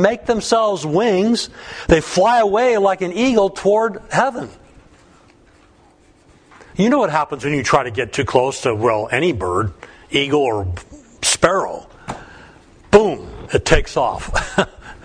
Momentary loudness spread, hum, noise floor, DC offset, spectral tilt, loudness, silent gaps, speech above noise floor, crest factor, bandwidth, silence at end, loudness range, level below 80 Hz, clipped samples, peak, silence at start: 14 LU; none; -51 dBFS; under 0.1%; -4.5 dB/octave; -17 LUFS; none; 34 dB; 18 dB; 10.5 kHz; 0.1 s; 6 LU; -34 dBFS; under 0.1%; 0 dBFS; 0 s